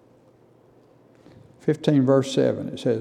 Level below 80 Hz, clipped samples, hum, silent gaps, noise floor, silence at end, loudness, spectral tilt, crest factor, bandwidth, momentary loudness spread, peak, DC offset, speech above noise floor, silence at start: -70 dBFS; under 0.1%; none; none; -55 dBFS; 0 s; -22 LUFS; -7 dB/octave; 20 dB; 11.5 kHz; 8 LU; -6 dBFS; under 0.1%; 35 dB; 1.65 s